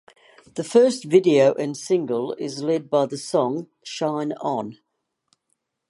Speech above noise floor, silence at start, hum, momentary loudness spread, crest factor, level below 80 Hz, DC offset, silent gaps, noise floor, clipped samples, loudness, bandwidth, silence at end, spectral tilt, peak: 53 dB; 0.55 s; none; 13 LU; 18 dB; -76 dBFS; under 0.1%; none; -74 dBFS; under 0.1%; -22 LUFS; 11.5 kHz; 1.15 s; -5.5 dB/octave; -4 dBFS